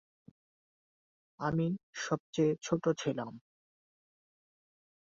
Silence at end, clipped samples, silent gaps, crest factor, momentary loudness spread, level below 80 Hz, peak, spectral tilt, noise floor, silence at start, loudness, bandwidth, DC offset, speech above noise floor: 1.65 s; under 0.1%; 1.83-1.93 s, 2.20-2.33 s; 20 dB; 8 LU; -70 dBFS; -16 dBFS; -6 dB/octave; under -90 dBFS; 1.4 s; -34 LUFS; 7.6 kHz; under 0.1%; over 57 dB